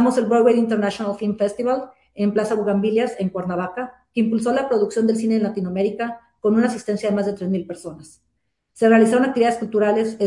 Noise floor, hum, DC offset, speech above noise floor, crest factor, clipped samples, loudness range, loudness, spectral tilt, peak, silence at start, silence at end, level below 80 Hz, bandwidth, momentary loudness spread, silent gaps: -72 dBFS; none; under 0.1%; 53 dB; 16 dB; under 0.1%; 3 LU; -20 LUFS; -6.5 dB/octave; -4 dBFS; 0 s; 0 s; -62 dBFS; 11.5 kHz; 10 LU; none